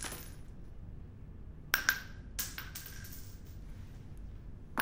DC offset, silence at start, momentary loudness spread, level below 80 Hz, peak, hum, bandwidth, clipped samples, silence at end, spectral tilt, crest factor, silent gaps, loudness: under 0.1%; 0 s; 20 LU; -50 dBFS; -8 dBFS; none; 16 kHz; under 0.1%; 0 s; -2 dB/octave; 32 dB; none; -38 LUFS